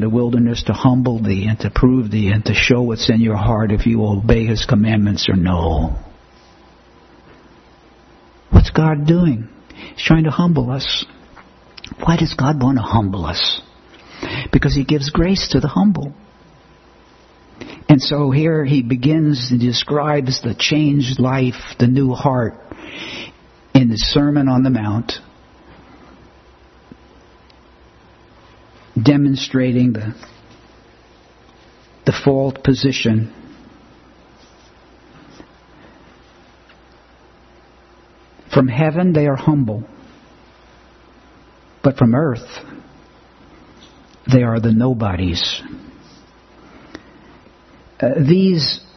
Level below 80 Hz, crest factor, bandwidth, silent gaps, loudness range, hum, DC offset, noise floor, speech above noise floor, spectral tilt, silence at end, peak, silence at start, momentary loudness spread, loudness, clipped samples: -32 dBFS; 18 dB; 6.4 kHz; none; 6 LU; none; under 0.1%; -48 dBFS; 32 dB; -6.5 dB/octave; 0.2 s; 0 dBFS; 0 s; 14 LU; -16 LUFS; under 0.1%